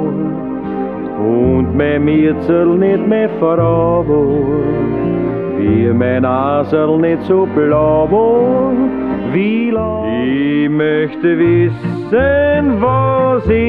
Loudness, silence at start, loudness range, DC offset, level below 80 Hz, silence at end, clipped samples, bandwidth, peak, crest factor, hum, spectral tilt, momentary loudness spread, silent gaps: -13 LUFS; 0 s; 2 LU; 0.3%; -36 dBFS; 0 s; under 0.1%; 4.8 kHz; -2 dBFS; 10 dB; none; -10.5 dB/octave; 6 LU; none